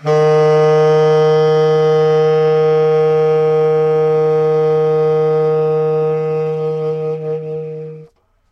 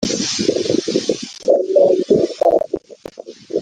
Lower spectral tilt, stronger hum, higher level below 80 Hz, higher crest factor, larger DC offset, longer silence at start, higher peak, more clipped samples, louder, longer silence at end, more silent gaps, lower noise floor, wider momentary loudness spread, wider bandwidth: first, -7.5 dB/octave vs -4 dB/octave; neither; second, -62 dBFS vs -52 dBFS; second, 10 dB vs 16 dB; neither; about the same, 0 s vs 0 s; about the same, -4 dBFS vs -2 dBFS; neither; first, -13 LUFS vs -17 LUFS; first, 0.45 s vs 0 s; neither; first, -45 dBFS vs -36 dBFS; second, 10 LU vs 20 LU; second, 6.6 kHz vs 10 kHz